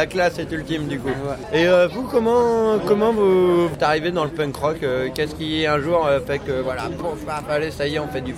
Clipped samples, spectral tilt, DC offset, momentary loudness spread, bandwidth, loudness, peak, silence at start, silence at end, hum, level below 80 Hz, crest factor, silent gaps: under 0.1%; -6 dB/octave; under 0.1%; 9 LU; 15.5 kHz; -20 LUFS; -4 dBFS; 0 s; 0 s; none; -44 dBFS; 16 dB; none